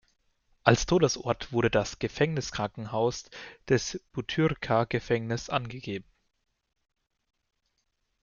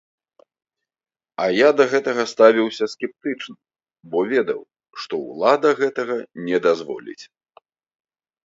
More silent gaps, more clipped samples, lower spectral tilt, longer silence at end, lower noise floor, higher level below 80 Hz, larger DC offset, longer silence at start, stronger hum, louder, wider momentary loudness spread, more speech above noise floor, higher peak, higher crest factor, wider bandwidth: neither; neither; about the same, -5 dB/octave vs -4.5 dB/octave; first, 2.2 s vs 1.2 s; first, -77 dBFS vs -56 dBFS; first, -52 dBFS vs -72 dBFS; neither; second, 0.65 s vs 1.4 s; neither; second, -28 LUFS vs -20 LUFS; second, 12 LU vs 18 LU; first, 49 dB vs 37 dB; second, -4 dBFS vs 0 dBFS; first, 26 dB vs 20 dB; about the same, 7.4 kHz vs 7.8 kHz